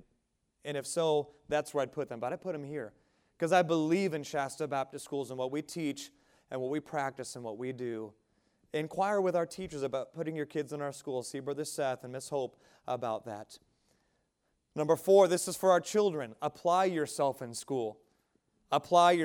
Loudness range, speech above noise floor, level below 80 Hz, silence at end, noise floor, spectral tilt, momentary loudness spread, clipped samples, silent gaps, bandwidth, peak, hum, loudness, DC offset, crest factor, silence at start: 9 LU; 47 dB; -74 dBFS; 0 s; -79 dBFS; -4.5 dB/octave; 14 LU; under 0.1%; none; 17.5 kHz; -12 dBFS; none; -33 LUFS; under 0.1%; 22 dB; 0.65 s